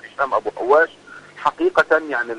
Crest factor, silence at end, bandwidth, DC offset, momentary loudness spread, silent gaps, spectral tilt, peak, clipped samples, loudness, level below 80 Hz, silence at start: 16 dB; 0 s; 10.5 kHz; under 0.1%; 7 LU; none; -4.5 dB/octave; -4 dBFS; under 0.1%; -19 LUFS; -58 dBFS; 0.05 s